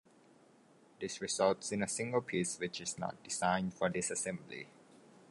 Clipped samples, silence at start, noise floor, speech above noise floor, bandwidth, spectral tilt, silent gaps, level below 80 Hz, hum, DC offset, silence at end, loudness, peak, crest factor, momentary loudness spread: under 0.1%; 1 s; -65 dBFS; 28 dB; 11.5 kHz; -3.5 dB/octave; none; -70 dBFS; none; under 0.1%; 0.35 s; -36 LUFS; -18 dBFS; 22 dB; 13 LU